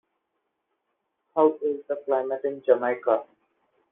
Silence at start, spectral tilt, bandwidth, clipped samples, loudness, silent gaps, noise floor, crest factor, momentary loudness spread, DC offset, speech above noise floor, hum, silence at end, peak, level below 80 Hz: 1.35 s; -4.5 dB/octave; 3.8 kHz; under 0.1%; -25 LUFS; none; -79 dBFS; 22 dB; 7 LU; under 0.1%; 54 dB; none; 0.7 s; -6 dBFS; -80 dBFS